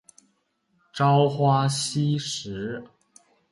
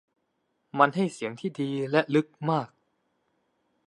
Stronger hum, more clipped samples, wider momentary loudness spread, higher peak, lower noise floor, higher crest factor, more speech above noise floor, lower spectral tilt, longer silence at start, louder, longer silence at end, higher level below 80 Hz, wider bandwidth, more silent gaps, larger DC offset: neither; neither; first, 14 LU vs 10 LU; second, -8 dBFS vs -4 dBFS; second, -70 dBFS vs -76 dBFS; second, 16 dB vs 24 dB; about the same, 47 dB vs 50 dB; about the same, -5.5 dB/octave vs -6.5 dB/octave; first, 0.95 s vs 0.75 s; first, -24 LUFS vs -27 LUFS; second, 0.65 s vs 1.2 s; first, -62 dBFS vs -80 dBFS; about the same, 11.5 kHz vs 11 kHz; neither; neither